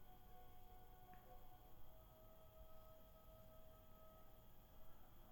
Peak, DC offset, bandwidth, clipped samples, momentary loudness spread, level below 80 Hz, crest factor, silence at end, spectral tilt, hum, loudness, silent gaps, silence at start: -48 dBFS; under 0.1%; over 20 kHz; under 0.1%; 3 LU; -66 dBFS; 12 dB; 0 s; -5.5 dB/octave; none; -67 LUFS; none; 0 s